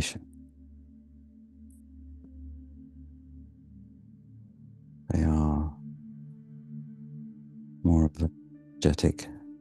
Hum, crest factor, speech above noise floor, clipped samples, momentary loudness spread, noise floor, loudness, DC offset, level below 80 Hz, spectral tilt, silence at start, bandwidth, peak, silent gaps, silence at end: none; 24 dB; 28 dB; under 0.1%; 27 LU; -53 dBFS; -28 LUFS; under 0.1%; -40 dBFS; -6.5 dB/octave; 0 s; 12 kHz; -8 dBFS; none; 0.05 s